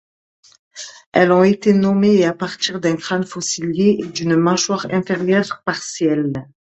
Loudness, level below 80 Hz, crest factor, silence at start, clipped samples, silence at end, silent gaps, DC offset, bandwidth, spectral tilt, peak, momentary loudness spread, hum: -17 LUFS; -58 dBFS; 18 dB; 0.75 s; under 0.1%; 0.3 s; 1.06-1.12 s; under 0.1%; 8.4 kHz; -5 dB/octave; 0 dBFS; 9 LU; none